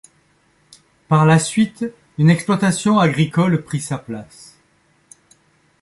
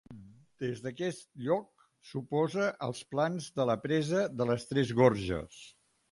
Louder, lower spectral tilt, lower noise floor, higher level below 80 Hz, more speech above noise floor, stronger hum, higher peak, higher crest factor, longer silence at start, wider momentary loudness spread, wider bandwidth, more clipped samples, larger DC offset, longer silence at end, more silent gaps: first, -17 LUFS vs -32 LUFS; about the same, -6 dB/octave vs -6.5 dB/octave; first, -59 dBFS vs -52 dBFS; about the same, -56 dBFS vs -60 dBFS; first, 43 dB vs 21 dB; neither; first, -2 dBFS vs -10 dBFS; second, 16 dB vs 22 dB; first, 1.1 s vs 0.1 s; about the same, 14 LU vs 13 LU; about the same, 11.5 kHz vs 11.5 kHz; neither; neither; first, 1.6 s vs 0.4 s; neither